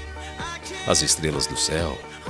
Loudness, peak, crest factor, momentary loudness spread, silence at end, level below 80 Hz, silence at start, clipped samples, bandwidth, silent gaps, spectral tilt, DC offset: -23 LUFS; -2 dBFS; 22 dB; 14 LU; 0 s; -40 dBFS; 0 s; under 0.1%; 14 kHz; none; -2.5 dB/octave; under 0.1%